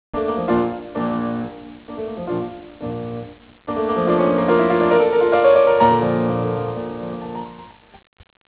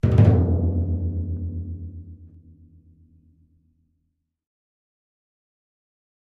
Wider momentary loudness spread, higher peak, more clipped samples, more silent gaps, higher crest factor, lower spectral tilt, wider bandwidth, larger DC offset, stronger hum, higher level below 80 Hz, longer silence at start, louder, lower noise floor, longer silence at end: second, 18 LU vs 22 LU; about the same, -2 dBFS vs -4 dBFS; neither; neither; second, 16 dB vs 22 dB; about the same, -11 dB/octave vs -11 dB/octave; about the same, 4 kHz vs 4 kHz; neither; neither; second, -48 dBFS vs -36 dBFS; about the same, 0.15 s vs 0.05 s; first, -19 LUFS vs -22 LUFS; second, -42 dBFS vs -75 dBFS; second, 0.8 s vs 4 s